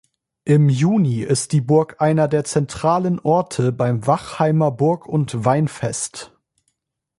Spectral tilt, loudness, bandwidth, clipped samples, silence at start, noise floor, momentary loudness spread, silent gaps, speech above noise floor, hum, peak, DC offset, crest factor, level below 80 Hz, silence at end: -6.5 dB/octave; -19 LUFS; 11.5 kHz; under 0.1%; 0.45 s; -74 dBFS; 6 LU; none; 56 dB; none; -2 dBFS; under 0.1%; 16 dB; -54 dBFS; 0.95 s